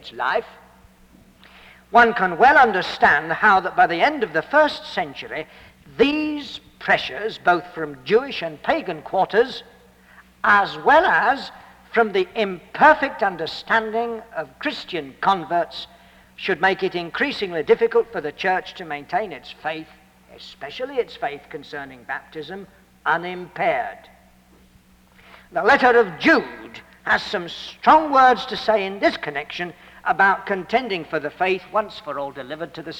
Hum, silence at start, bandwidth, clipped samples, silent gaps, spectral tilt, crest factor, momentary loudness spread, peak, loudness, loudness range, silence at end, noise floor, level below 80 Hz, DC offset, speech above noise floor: none; 0.05 s; 16 kHz; under 0.1%; none; -5 dB/octave; 18 dB; 17 LU; -4 dBFS; -20 LUFS; 10 LU; 0 s; -53 dBFS; -56 dBFS; under 0.1%; 33 dB